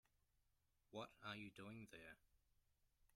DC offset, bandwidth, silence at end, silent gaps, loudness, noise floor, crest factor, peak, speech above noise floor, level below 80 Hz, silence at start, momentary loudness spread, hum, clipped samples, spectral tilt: under 0.1%; 14.5 kHz; 0.1 s; none; -57 LUFS; -85 dBFS; 24 dB; -38 dBFS; 27 dB; -82 dBFS; 0.9 s; 7 LU; none; under 0.1%; -5 dB/octave